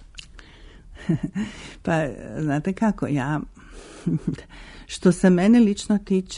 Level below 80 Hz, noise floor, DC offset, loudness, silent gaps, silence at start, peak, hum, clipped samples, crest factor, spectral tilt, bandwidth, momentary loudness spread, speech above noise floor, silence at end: -46 dBFS; -45 dBFS; under 0.1%; -23 LUFS; none; 0.15 s; -6 dBFS; none; under 0.1%; 18 dB; -6.5 dB/octave; 11 kHz; 22 LU; 24 dB; 0 s